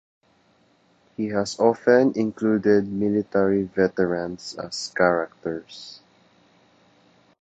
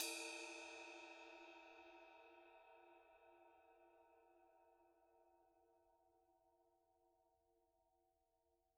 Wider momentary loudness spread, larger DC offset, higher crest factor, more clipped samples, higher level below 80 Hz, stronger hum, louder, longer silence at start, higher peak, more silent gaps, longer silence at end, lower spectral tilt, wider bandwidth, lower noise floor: second, 15 LU vs 18 LU; neither; second, 20 dB vs 32 dB; neither; first, -60 dBFS vs under -90 dBFS; neither; first, -22 LUFS vs -55 LUFS; first, 1.2 s vs 0 s; first, -4 dBFS vs -28 dBFS; neither; first, 1.45 s vs 0.9 s; first, -5.5 dB/octave vs 0.5 dB/octave; second, 8.8 kHz vs 11.5 kHz; second, -61 dBFS vs -86 dBFS